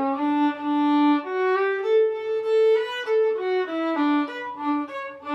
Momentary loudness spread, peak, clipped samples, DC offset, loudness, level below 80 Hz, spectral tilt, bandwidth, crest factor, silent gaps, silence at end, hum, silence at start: 7 LU; -12 dBFS; under 0.1%; under 0.1%; -23 LUFS; -72 dBFS; -5 dB/octave; 7.8 kHz; 12 dB; none; 0 s; none; 0 s